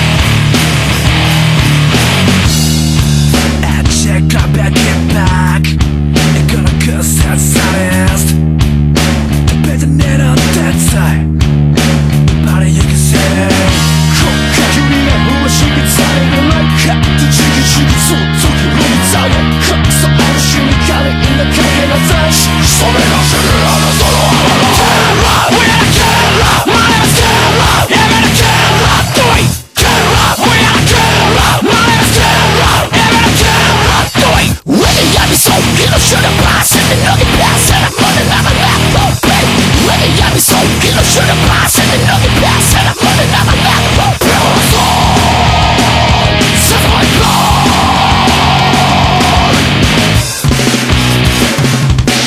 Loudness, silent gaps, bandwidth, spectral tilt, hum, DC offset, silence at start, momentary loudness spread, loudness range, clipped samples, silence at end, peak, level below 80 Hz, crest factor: -8 LUFS; none; 15.5 kHz; -4 dB/octave; none; under 0.1%; 0 s; 3 LU; 3 LU; 0.6%; 0 s; 0 dBFS; -18 dBFS; 8 dB